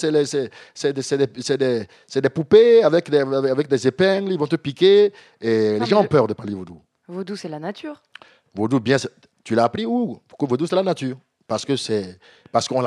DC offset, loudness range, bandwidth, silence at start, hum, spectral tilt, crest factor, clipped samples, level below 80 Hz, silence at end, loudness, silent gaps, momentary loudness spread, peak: under 0.1%; 7 LU; 11 kHz; 0 s; none; -5.5 dB/octave; 18 dB; under 0.1%; -64 dBFS; 0 s; -20 LUFS; none; 16 LU; -2 dBFS